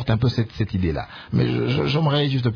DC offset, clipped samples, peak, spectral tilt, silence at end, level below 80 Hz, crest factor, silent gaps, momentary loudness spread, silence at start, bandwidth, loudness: under 0.1%; under 0.1%; -8 dBFS; -8 dB/octave; 0 s; -40 dBFS; 12 dB; none; 6 LU; 0 s; 5.4 kHz; -22 LUFS